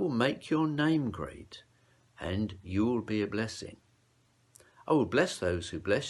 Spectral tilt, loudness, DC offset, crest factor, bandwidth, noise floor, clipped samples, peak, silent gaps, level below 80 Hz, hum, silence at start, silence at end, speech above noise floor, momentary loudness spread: -6 dB/octave; -31 LUFS; under 0.1%; 20 dB; 12 kHz; -68 dBFS; under 0.1%; -12 dBFS; none; -62 dBFS; none; 0 s; 0 s; 38 dB; 17 LU